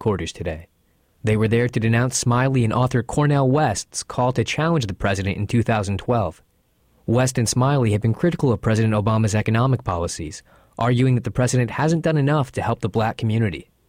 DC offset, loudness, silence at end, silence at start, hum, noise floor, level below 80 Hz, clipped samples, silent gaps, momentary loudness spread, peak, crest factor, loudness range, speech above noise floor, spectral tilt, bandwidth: under 0.1%; -21 LUFS; 0.25 s; 0 s; none; -62 dBFS; -44 dBFS; under 0.1%; none; 8 LU; -8 dBFS; 12 dB; 2 LU; 42 dB; -6 dB/octave; 15 kHz